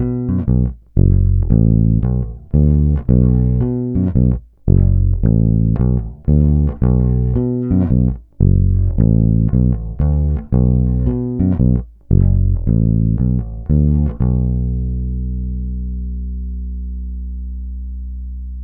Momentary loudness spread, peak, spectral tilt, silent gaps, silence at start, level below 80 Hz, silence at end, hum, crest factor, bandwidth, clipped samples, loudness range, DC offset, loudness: 13 LU; 0 dBFS; -15 dB/octave; none; 0 s; -20 dBFS; 0 s; 60 Hz at -35 dBFS; 14 dB; 2.1 kHz; under 0.1%; 7 LU; under 0.1%; -16 LUFS